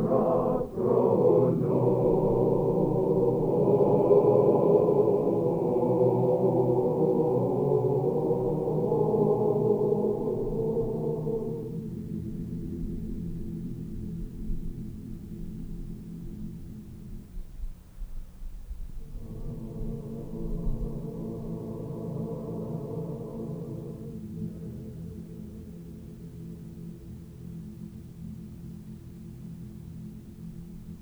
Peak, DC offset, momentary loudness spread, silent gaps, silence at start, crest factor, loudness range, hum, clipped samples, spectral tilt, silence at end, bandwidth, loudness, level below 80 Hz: -8 dBFS; under 0.1%; 21 LU; none; 0 s; 20 dB; 19 LU; none; under 0.1%; -11 dB/octave; 0 s; over 20 kHz; -27 LUFS; -42 dBFS